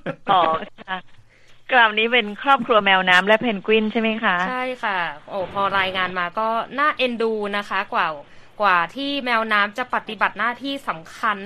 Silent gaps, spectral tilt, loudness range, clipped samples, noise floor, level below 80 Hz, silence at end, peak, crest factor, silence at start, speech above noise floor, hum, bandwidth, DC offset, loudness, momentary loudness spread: none; -4.5 dB/octave; 5 LU; under 0.1%; -47 dBFS; -56 dBFS; 0 s; -2 dBFS; 20 dB; 0.05 s; 26 dB; none; 13.5 kHz; under 0.1%; -20 LUFS; 12 LU